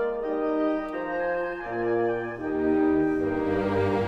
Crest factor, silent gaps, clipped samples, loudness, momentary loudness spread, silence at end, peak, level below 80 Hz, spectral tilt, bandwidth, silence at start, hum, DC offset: 12 dB; none; under 0.1%; -26 LUFS; 7 LU; 0 s; -14 dBFS; -50 dBFS; -8.5 dB/octave; 6.2 kHz; 0 s; none; under 0.1%